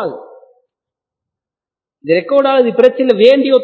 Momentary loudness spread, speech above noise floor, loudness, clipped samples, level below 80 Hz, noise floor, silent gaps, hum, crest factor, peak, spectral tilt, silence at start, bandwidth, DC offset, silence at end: 10 LU; 79 dB; -11 LUFS; 0.3%; -64 dBFS; -89 dBFS; none; none; 14 dB; 0 dBFS; -6.5 dB/octave; 0 s; 5.6 kHz; under 0.1%; 0 s